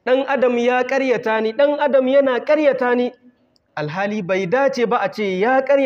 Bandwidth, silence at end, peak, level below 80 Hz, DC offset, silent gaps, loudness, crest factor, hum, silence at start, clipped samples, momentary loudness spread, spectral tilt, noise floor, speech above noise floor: 7.2 kHz; 0 s; -4 dBFS; -70 dBFS; under 0.1%; none; -18 LUFS; 14 dB; none; 0.05 s; under 0.1%; 7 LU; -6 dB/octave; -55 dBFS; 38 dB